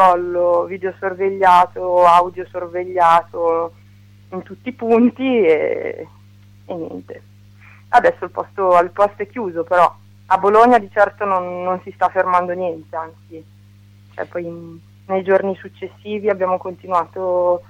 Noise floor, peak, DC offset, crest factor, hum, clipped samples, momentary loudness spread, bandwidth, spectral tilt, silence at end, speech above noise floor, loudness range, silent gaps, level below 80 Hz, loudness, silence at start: -45 dBFS; 0 dBFS; under 0.1%; 16 dB; 50 Hz at -45 dBFS; under 0.1%; 17 LU; 12.5 kHz; -6.5 dB/octave; 0.1 s; 29 dB; 7 LU; none; -58 dBFS; -17 LUFS; 0 s